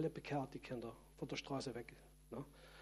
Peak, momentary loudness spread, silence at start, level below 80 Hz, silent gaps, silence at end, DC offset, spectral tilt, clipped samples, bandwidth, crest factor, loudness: -30 dBFS; 11 LU; 0 s; -66 dBFS; none; 0 s; under 0.1%; -5.5 dB/octave; under 0.1%; 14.5 kHz; 18 dB; -48 LUFS